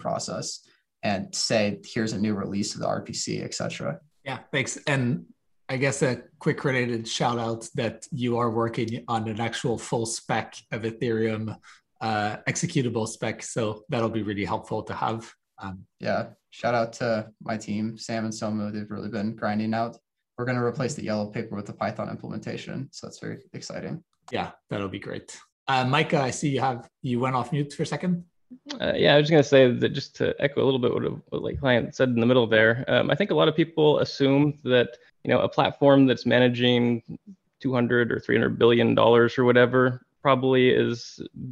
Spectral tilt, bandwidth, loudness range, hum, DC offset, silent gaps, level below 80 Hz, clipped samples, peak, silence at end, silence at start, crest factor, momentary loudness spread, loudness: -5.5 dB/octave; 11.5 kHz; 9 LU; none; under 0.1%; 25.52-25.66 s; -60 dBFS; under 0.1%; -4 dBFS; 0 s; 0 s; 22 dB; 15 LU; -25 LUFS